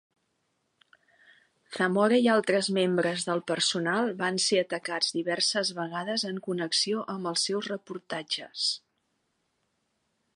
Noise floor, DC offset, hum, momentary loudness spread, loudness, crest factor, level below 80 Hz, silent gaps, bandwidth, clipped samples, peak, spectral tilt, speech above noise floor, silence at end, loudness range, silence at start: -77 dBFS; under 0.1%; none; 10 LU; -27 LUFS; 20 dB; -80 dBFS; none; 11.5 kHz; under 0.1%; -10 dBFS; -3 dB/octave; 49 dB; 1.55 s; 5 LU; 1.7 s